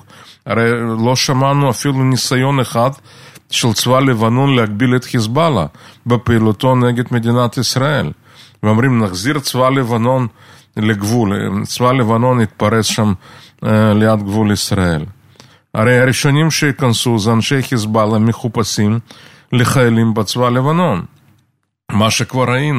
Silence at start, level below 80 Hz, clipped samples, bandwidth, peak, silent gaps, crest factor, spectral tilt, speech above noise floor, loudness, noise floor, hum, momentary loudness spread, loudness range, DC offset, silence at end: 0.45 s; -46 dBFS; under 0.1%; 15.5 kHz; 0 dBFS; none; 14 dB; -5.5 dB/octave; 47 dB; -14 LUFS; -61 dBFS; none; 7 LU; 2 LU; under 0.1%; 0 s